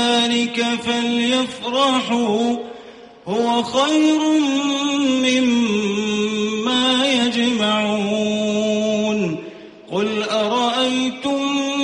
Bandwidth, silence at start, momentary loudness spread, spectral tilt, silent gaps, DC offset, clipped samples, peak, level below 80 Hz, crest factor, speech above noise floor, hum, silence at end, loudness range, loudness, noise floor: 10.5 kHz; 0 s; 6 LU; -3.5 dB/octave; none; under 0.1%; under 0.1%; -6 dBFS; -60 dBFS; 14 dB; 22 dB; none; 0 s; 3 LU; -18 LUFS; -40 dBFS